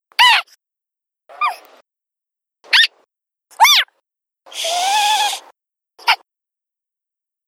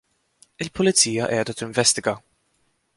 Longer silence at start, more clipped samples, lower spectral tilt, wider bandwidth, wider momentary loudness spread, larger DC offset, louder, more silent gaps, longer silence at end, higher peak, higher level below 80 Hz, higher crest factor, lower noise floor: second, 0.2 s vs 0.6 s; neither; second, 5 dB/octave vs -2.5 dB/octave; first, 17.5 kHz vs 11.5 kHz; about the same, 14 LU vs 15 LU; neither; first, -14 LUFS vs -20 LUFS; neither; first, 1.35 s vs 0.8 s; about the same, 0 dBFS vs -2 dBFS; second, -78 dBFS vs -56 dBFS; about the same, 20 dB vs 22 dB; first, -83 dBFS vs -68 dBFS